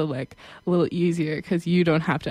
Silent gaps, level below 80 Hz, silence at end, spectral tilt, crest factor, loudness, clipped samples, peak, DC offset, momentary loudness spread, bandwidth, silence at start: none; -58 dBFS; 0 s; -7.5 dB/octave; 14 dB; -24 LUFS; under 0.1%; -8 dBFS; under 0.1%; 12 LU; 11 kHz; 0 s